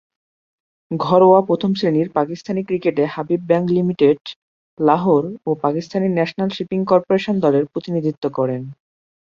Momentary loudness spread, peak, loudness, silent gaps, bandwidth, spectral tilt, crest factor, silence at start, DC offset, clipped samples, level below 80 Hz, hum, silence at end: 9 LU; -2 dBFS; -18 LUFS; 4.21-4.25 s, 4.36-4.77 s; 7.2 kHz; -8 dB/octave; 16 dB; 0.9 s; under 0.1%; under 0.1%; -60 dBFS; none; 0.45 s